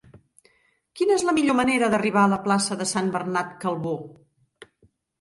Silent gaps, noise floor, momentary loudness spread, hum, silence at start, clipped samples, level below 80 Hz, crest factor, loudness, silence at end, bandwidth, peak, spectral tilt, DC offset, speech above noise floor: none; -65 dBFS; 8 LU; none; 0.95 s; under 0.1%; -62 dBFS; 16 dB; -23 LUFS; 1.1 s; 11.5 kHz; -8 dBFS; -4.5 dB/octave; under 0.1%; 42 dB